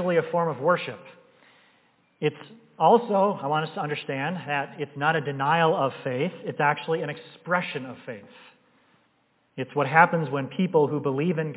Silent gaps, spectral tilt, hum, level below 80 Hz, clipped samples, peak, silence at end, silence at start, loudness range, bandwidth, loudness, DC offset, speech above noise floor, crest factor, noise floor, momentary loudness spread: none; -10 dB/octave; none; -80 dBFS; under 0.1%; -4 dBFS; 0 s; 0 s; 4 LU; 4 kHz; -25 LUFS; under 0.1%; 42 dB; 22 dB; -67 dBFS; 16 LU